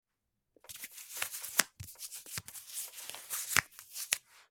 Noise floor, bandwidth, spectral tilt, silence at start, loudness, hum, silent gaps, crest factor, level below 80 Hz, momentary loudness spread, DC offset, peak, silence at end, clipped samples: -85 dBFS; 19.5 kHz; 0.5 dB/octave; 0.65 s; -36 LUFS; none; none; 38 dB; -70 dBFS; 15 LU; under 0.1%; -2 dBFS; 0.1 s; under 0.1%